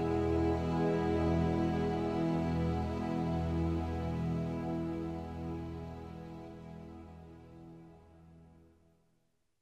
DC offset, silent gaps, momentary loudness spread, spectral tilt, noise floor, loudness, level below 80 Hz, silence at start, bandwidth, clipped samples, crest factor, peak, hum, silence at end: under 0.1%; none; 20 LU; -8.5 dB/octave; -78 dBFS; -34 LUFS; -48 dBFS; 0 s; 8.6 kHz; under 0.1%; 14 dB; -20 dBFS; none; 1.15 s